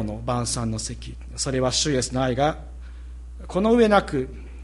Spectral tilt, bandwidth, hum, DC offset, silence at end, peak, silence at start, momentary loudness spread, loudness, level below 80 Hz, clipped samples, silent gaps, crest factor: -4.5 dB/octave; 11.5 kHz; none; under 0.1%; 0 s; -4 dBFS; 0 s; 22 LU; -23 LUFS; -38 dBFS; under 0.1%; none; 20 dB